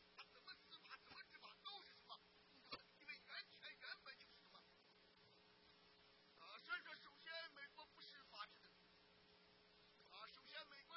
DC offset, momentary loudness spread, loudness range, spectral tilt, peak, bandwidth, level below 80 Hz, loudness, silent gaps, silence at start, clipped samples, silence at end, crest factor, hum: under 0.1%; 11 LU; 4 LU; 1.5 dB/octave; -38 dBFS; 5.6 kHz; under -90 dBFS; -58 LUFS; none; 0 s; under 0.1%; 0 s; 24 dB; none